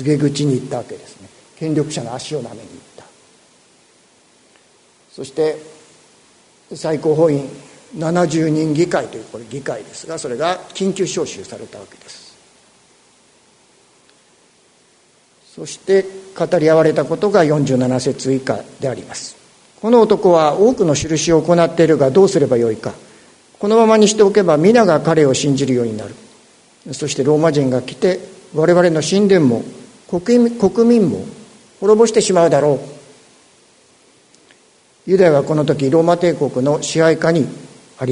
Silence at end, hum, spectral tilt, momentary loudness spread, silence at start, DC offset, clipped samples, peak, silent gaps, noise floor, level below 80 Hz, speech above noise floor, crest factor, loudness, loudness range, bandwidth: 0 s; none; -5.5 dB/octave; 17 LU; 0 s; under 0.1%; under 0.1%; 0 dBFS; none; -53 dBFS; -54 dBFS; 39 dB; 16 dB; -15 LUFS; 13 LU; 11 kHz